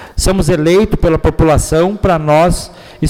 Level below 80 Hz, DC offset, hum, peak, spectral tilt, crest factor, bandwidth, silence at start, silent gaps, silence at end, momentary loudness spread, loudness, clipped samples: -20 dBFS; under 0.1%; none; -2 dBFS; -6 dB/octave; 8 dB; 17 kHz; 0 s; none; 0 s; 4 LU; -12 LUFS; under 0.1%